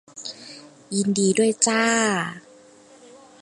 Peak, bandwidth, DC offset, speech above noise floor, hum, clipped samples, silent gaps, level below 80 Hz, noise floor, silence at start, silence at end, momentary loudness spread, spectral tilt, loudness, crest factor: -2 dBFS; 11.5 kHz; under 0.1%; 29 dB; none; under 0.1%; none; -68 dBFS; -50 dBFS; 0.15 s; 1 s; 22 LU; -3.5 dB/octave; -21 LUFS; 22 dB